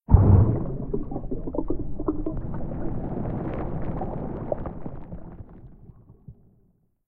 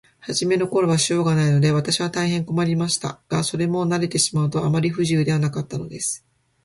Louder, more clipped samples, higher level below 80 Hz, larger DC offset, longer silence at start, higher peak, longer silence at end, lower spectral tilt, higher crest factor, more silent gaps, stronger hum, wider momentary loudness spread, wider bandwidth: second, -27 LUFS vs -21 LUFS; neither; first, -32 dBFS vs -54 dBFS; neither; second, 0.1 s vs 0.25 s; first, -2 dBFS vs -6 dBFS; first, 0.75 s vs 0.5 s; first, -14 dB/octave vs -5 dB/octave; first, 24 dB vs 16 dB; neither; neither; first, 22 LU vs 7 LU; second, 2.7 kHz vs 11.5 kHz